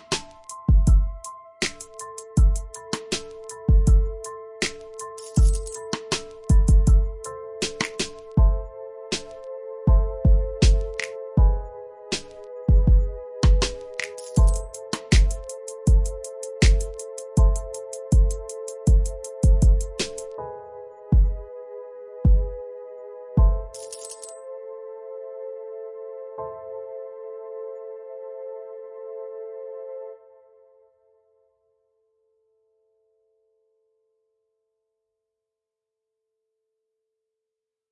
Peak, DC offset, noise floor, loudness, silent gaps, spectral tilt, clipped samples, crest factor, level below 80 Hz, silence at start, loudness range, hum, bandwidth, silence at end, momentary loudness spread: -4 dBFS; under 0.1%; -86 dBFS; -24 LUFS; none; -5.5 dB/octave; under 0.1%; 18 dB; -24 dBFS; 0.1 s; 14 LU; none; 11.5 kHz; 7.75 s; 17 LU